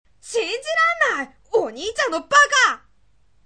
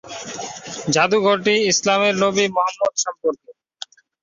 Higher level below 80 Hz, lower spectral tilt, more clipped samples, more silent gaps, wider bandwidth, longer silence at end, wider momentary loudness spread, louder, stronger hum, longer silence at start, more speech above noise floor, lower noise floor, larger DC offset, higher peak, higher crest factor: about the same, -58 dBFS vs -62 dBFS; second, 0 dB/octave vs -3 dB/octave; neither; neither; first, 9.8 kHz vs 7.8 kHz; about the same, 0.7 s vs 0.7 s; second, 12 LU vs 19 LU; about the same, -19 LUFS vs -18 LUFS; neither; first, 0.25 s vs 0.05 s; first, 44 dB vs 22 dB; first, -62 dBFS vs -40 dBFS; first, 0.2% vs under 0.1%; about the same, -2 dBFS vs -4 dBFS; about the same, 18 dB vs 16 dB